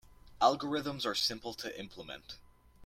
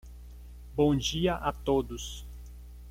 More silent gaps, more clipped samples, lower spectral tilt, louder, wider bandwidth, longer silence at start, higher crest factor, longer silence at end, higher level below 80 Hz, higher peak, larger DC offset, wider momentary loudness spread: neither; neither; second, -3.5 dB/octave vs -5.5 dB/octave; second, -33 LUFS vs -30 LUFS; about the same, 16.5 kHz vs 16.5 kHz; about the same, 0.1 s vs 0.05 s; about the same, 24 dB vs 20 dB; about the same, 0 s vs 0 s; second, -64 dBFS vs -44 dBFS; about the same, -12 dBFS vs -12 dBFS; neither; second, 17 LU vs 23 LU